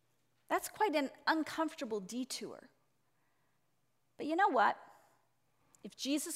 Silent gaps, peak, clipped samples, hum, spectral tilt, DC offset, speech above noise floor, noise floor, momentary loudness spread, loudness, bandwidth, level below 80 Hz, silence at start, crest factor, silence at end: none; -18 dBFS; under 0.1%; none; -2.5 dB/octave; under 0.1%; 45 dB; -81 dBFS; 16 LU; -36 LUFS; 16 kHz; -84 dBFS; 0.5 s; 22 dB; 0 s